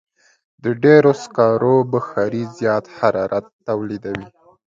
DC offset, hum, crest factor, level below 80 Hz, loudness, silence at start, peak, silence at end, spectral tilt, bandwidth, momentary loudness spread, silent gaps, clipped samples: under 0.1%; none; 18 dB; -58 dBFS; -18 LUFS; 0.65 s; 0 dBFS; 0.4 s; -7.5 dB/octave; 7.6 kHz; 14 LU; 3.53-3.59 s; under 0.1%